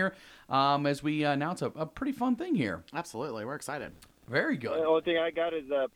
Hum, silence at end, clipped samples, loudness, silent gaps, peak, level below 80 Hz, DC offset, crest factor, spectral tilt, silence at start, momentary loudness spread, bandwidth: none; 0.05 s; under 0.1%; -31 LUFS; none; -12 dBFS; -64 dBFS; under 0.1%; 18 dB; -5.5 dB/octave; 0 s; 10 LU; 16.5 kHz